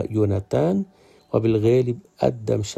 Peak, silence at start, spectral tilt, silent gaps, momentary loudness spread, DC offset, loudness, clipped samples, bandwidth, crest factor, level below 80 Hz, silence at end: -4 dBFS; 0 s; -7.5 dB/octave; none; 8 LU; under 0.1%; -22 LUFS; under 0.1%; 11.5 kHz; 18 dB; -50 dBFS; 0 s